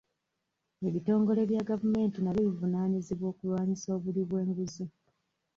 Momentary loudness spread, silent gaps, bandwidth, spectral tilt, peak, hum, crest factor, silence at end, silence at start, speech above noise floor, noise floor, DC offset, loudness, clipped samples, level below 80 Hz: 8 LU; none; 7.4 kHz; -8 dB/octave; -18 dBFS; none; 14 dB; 0.7 s; 0.8 s; 53 dB; -83 dBFS; under 0.1%; -31 LUFS; under 0.1%; -64 dBFS